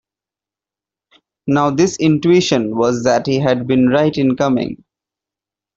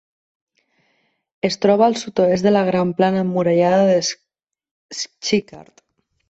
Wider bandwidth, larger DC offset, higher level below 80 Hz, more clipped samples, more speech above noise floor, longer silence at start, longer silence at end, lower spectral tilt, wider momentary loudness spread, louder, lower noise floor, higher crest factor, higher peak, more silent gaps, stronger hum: about the same, 7.8 kHz vs 8.2 kHz; neither; first, -52 dBFS vs -60 dBFS; neither; first, 74 dB vs 49 dB; about the same, 1.45 s vs 1.45 s; first, 1 s vs 0.7 s; about the same, -6 dB/octave vs -5 dB/octave; second, 6 LU vs 11 LU; first, -15 LUFS vs -18 LUFS; first, -88 dBFS vs -66 dBFS; about the same, 14 dB vs 16 dB; about the same, -2 dBFS vs -2 dBFS; second, none vs 4.71-4.89 s; neither